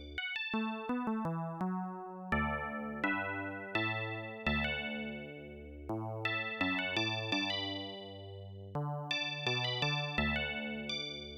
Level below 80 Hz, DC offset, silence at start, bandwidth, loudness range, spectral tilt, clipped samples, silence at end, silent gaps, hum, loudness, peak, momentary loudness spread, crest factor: -54 dBFS; under 0.1%; 0 s; 13.5 kHz; 1 LU; -5 dB/octave; under 0.1%; 0 s; none; none; -36 LUFS; -20 dBFS; 11 LU; 16 dB